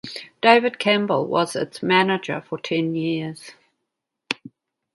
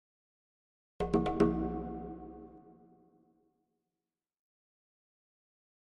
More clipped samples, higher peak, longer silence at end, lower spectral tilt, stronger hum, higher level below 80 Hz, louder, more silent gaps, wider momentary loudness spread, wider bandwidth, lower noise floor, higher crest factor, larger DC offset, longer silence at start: neither; first, -2 dBFS vs -14 dBFS; second, 0.6 s vs 3.2 s; second, -5 dB/octave vs -8.5 dB/octave; neither; second, -70 dBFS vs -52 dBFS; first, -21 LUFS vs -33 LUFS; neither; second, 14 LU vs 21 LU; first, 11.5 kHz vs 9 kHz; second, -80 dBFS vs under -90 dBFS; about the same, 22 dB vs 26 dB; neither; second, 0.05 s vs 1 s